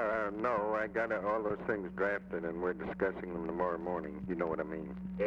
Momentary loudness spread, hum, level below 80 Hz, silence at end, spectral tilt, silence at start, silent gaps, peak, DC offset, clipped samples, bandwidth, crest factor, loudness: 6 LU; none; -60 dBFS; 0 s; -8.5 dB/octave; 0 s; none; -18 dBFS; under 0.1%; under 0.1%; 7.4 kHz; 16 dB; -36 LUFS